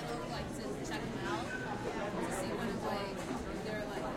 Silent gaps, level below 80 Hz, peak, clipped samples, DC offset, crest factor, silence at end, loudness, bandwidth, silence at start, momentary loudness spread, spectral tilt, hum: none; -54 dBFS; -24 dBFS; under 0.1%; under 0.1%; 14 dB; 0 s; -39 LUFS; 16.5 kHz; 0 s; 3 LU; -5 dB/octave; none